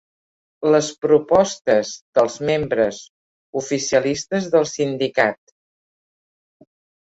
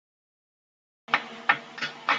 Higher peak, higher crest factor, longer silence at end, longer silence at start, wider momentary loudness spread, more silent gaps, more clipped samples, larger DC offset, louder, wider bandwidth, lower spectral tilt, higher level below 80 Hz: about the same, -2 dBFS vs -4 dBFS; second, 18 dB vs 28 dB; first, 1.7 s vs 0 s; second, 0.6 s vs 1.1 s; about the same, 7 LU vs 5 LU; first, 1.61-1.65 s, 2.02-2.13 s, 3.09-3.53 s vs none; neither; neither; first, -19 LUFS vs -27 LUFS; second, 8 kHz vs 9.2 kHz; first, -4.5 dB/octave vs -2 dB/octave; first, -56 dBFS vs -82 dBFS